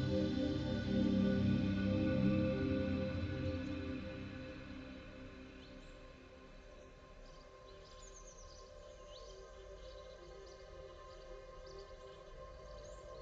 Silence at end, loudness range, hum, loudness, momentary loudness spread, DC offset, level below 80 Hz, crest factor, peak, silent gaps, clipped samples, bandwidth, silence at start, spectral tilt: 0 s; 20 LU; none; -38 LUFS; 23 LU; under 0.1%; -54 dBFS; 18 dB; -22 dBFS; none; under 0.1%; 7.8 kHz; 0 s; -7.5 dB/octave